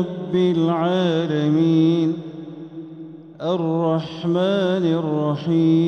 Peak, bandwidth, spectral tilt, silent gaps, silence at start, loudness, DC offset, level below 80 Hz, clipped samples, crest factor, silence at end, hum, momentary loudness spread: -8 dBFS; 6.6 kHz; -8.5 dB/octave; none; 0 s; -20 LUFS; under 0.1%; -66 dBFS; under 0.1%; 12 dB; 0 s; none; 18 LU